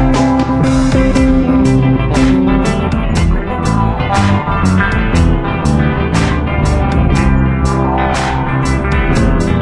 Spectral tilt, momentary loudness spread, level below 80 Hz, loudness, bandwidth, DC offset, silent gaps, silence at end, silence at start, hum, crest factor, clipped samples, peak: -7 dB/octave; 4 LU; -18 dBFS; -12 LUFS; 11.5 kHz; under 0.1%; none; 0 s; 0 s; none; 10 dB; under 0.1%; 0 dBFS